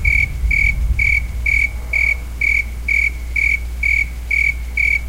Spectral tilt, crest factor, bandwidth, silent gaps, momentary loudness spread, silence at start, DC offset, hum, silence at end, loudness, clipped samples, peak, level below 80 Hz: -4 dB/octave; 14 dB; 16.5 kHz; none; 3 LU; 0 s; under 0.1%; none; 0 s; -16 LUFS; under 0.1%; -2 dBFS; -22 dBFS